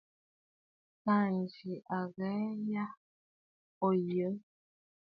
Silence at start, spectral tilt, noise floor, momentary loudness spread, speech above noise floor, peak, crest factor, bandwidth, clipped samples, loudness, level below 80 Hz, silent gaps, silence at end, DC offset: 1.05 s; -10.5 dB/octave; under -90 dBFS; 10 LU; over 56 dB; -18 dBFS; 18 dB; 5.2 kHz; under 0.1%; -35 LUFS; -82 dBFS; 2.97-3.81 s; 0.65 s; under 0.1%